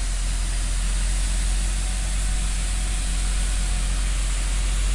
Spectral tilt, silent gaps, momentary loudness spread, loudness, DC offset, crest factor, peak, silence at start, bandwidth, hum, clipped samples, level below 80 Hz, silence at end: -3 dB/octave; none; 1 LU; -26 LUFS; under 0.1%; 8 dB; -14 dBFS; 0 s; 11.5 kHz; none; under 0.1%; -22 dBFS; 0 s